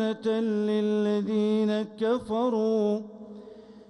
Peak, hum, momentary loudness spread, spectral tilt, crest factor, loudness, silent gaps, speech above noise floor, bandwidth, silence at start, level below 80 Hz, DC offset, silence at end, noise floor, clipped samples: -16 dBFS; none; 15 LU; -7.5 dB/octave; 12 dB; -27 LUFS; none; 21 dB; 10 kHz; 0 s; -66 dBFS; under 0.1%; 0.1 s; -47 dBFS; under 0.1%